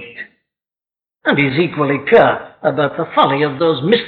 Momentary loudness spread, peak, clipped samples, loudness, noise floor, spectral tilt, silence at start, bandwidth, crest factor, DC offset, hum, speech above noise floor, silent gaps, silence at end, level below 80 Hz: 10 LU; -2 dBFS; under 0.1%; -15 LUFS; under -90 dBFS; -8.5 dB/octave; 0 s; 4.7 kHz; 14 dB; under 0.1%; none; over 76 dB; none; 0 s; -54 dBFS